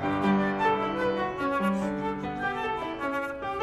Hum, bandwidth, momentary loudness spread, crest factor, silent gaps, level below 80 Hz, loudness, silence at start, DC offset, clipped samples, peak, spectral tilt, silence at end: none; 13 kHz; 6 LU; 14 dB; none; -52 dBFS; -28 LUFS; 0 s; under 0.1%; under 0.1%; -14 dBFS; -7 dB/octave; 0 s